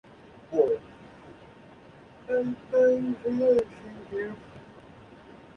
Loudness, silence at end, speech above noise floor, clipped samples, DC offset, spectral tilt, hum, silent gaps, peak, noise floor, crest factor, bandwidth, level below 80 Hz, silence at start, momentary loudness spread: -27 LUFS; 0.4 s; 26 dB; under 0.1%; under 0.1%; -7.5 dB/octave; none; none; -10 dBFS; -51 dBFS; 20 dB; 6.2 kHz; -62 dBFS; 0.5 s; 26 LU